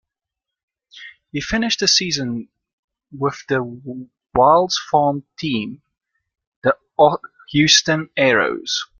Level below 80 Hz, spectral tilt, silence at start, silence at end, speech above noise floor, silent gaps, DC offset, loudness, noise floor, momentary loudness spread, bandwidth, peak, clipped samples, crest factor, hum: -50 dBFS; -3 dB/octave; 0.95 s; 0.15 s; 67 dB; 2.73-2.88 s, 6.47-6.62 s; under 0.1%; -17 LUFS; -85 dBFS; 16 LU; 11 kHz; 0 dBFS; under 0.1%; 20 dB; none